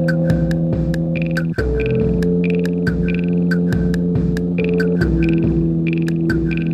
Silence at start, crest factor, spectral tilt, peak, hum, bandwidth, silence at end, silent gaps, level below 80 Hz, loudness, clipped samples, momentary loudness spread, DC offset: 0 s; 12 dB; -9 dB/octave; -4 dBFS; none; 8.6 kHz; 0 s; none; -28 dBFS; -18 LUFS; under 0.1%; 3 LU; under 0.1%